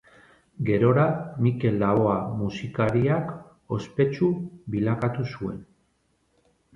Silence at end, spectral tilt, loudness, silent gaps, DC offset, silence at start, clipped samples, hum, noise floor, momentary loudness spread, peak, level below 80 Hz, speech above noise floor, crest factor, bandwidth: 1.1 s; -9 dB/octave; -25 LUFS; none; under 0.1%; 0.6 s; under 0.1%; none; -69 dBFS; 11 LU; -8 dBFS; -54 dBFS; 45 dB; 18 dB; 7.4 kHz